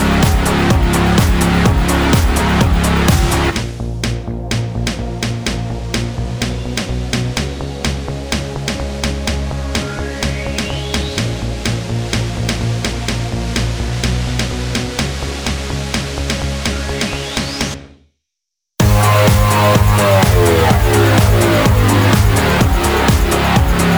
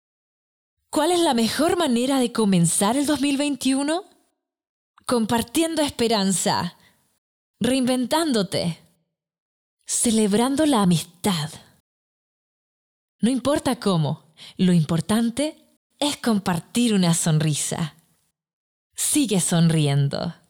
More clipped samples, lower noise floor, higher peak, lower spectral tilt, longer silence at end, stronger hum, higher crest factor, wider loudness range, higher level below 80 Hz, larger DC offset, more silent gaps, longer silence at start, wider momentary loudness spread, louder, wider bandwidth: neither; first, -79 dBFS vs -71 dBFS; first, 0 dBFS vs -12 dBFS; about the same, -5 dB/octave vs -4.5 dB/octave; second, 0 s vs 0.15 s; neither; about the same, 14 dB vs 12 dB; first, 9 LU vs 4 LU; first, -22 dBFS vs -58 dBFS; neither; second, none vs 4.69-4.94 s, 7.18-7.54 s, 9.38-9.77 s, 11.80-13.19 s, 15.77-15.90 s, 18.53-18.90 s; second, 0 s vs 0.9 s; about the same, 10 LU vs 8 LU; first, -15 LUFS vs -21 LUFS; first, over 20 kHz vs 17.5 kHz